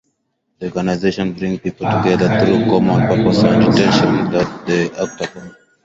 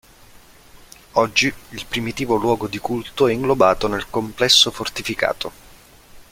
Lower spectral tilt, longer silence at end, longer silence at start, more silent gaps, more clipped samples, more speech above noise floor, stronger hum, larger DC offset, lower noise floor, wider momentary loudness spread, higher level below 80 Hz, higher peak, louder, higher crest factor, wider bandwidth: first, -6.5 dB/octave vs -3 dB/octave; first, 0.35 s vs 0.1 s; second, 0.6 s vs 1.15 s; neither; neither; first, 54 dB vs 27 dB; neither; neither; first, -69 dBFS vs -47 dBFS; about the same, 11 LU vs 13 LU; about the same, -44 dBFS vs -46 dBFS; about the same, 0 dBFS vs 0 dBFS; first, -15 LUFS vs -19 LUFS; about the same, 16 dB vs 20 dB; second, 7.8 kHz vs 16.5 kHz